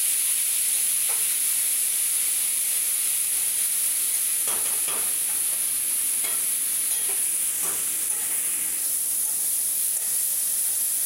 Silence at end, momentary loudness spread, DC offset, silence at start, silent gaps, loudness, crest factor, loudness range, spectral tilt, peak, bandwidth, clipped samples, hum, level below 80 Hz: 0 s; 2 LU; under 0.1%; 0 s; none; -21 LUFS; 14 dB; 2 LU; 2.5 dB/octave; -10 dBFS; 16 kHz; under 0.1%; none; -70 dBFS